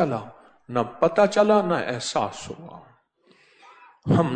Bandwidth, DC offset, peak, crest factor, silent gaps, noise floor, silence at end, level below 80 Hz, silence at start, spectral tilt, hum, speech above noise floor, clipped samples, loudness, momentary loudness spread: 9.4 kHz; under 0.1%; -6 dBFS; 18 dB; none; -60 dBFS; 0 s; -60 dBFS; 0 s; -6 dB/octave; none; 38 dB; under 0.1%; -23 LUFS; 19 LU